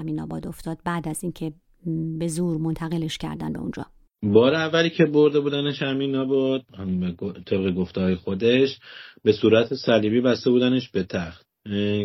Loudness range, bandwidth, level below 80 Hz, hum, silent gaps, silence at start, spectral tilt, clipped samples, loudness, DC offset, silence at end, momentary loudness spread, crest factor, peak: 7 LU; 15 kHz; -54 dBFS; none; none; 0 s; -6.5 dB/octave; under 0.1%; -23 LUFS; under 0.1%; 0 s; 14 LU; 20 dB; -4 dBFS